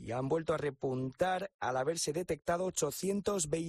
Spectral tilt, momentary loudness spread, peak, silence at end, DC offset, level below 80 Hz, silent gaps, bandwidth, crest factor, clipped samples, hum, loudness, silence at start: -4.5 dB/octave; 3 LU; -20 dBFS; 0 s; under 0.1%; -62 dBFS; 1.54-1.59 s; 13.5 kHz; 16 dB; under 0.1%; none; -35 LUFS; 0 s